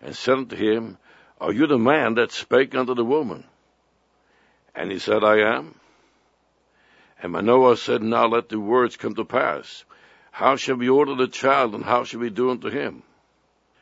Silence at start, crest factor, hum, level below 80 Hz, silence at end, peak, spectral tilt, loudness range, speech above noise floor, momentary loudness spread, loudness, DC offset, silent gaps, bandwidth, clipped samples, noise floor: 0 s; 20 dB; none; -68 dBFS; 0.85 s; -2 dBFS; -5.5 dB/octave; 4 LU; 44 dB; 14 LU; -21 LUFS; under 0.1%; none; 8 kHz; under 0.1%; -65 dBFS